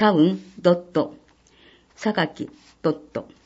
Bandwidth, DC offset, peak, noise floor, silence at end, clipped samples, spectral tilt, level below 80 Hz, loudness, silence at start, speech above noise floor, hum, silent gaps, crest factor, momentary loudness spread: 8 kHz; under 0.1%; -4 dBFS; -55 dBFS; 0.2 s; under 0.1%; -7 dB/octave; -64 dBFS; -23 LUFS; 0 s; 33 dB; none; none; 18 dB; 13 LU